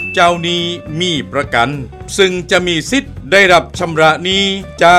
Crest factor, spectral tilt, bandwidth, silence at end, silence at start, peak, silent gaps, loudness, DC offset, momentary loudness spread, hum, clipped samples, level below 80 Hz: 12 dB; -4 dB/octave; 16 kHz; 0 s; 0 s; 0 dBFS; none; -13 LUFS; under 0.1%; 8 LU; none; 0.3%; -38 dBFS